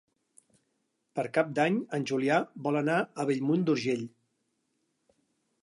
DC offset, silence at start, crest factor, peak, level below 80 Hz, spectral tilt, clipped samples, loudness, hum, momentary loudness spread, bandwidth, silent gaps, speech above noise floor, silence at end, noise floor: under 0.1%; 1.15 s; 20 dB; -12 dBFS; -82 dBFS; -6.5 dB/octave; under 0.1%; -29 LUFS; none; 7 LU; 11.5 kHz; none; 49 dB; 1.55 s; -78 dBFS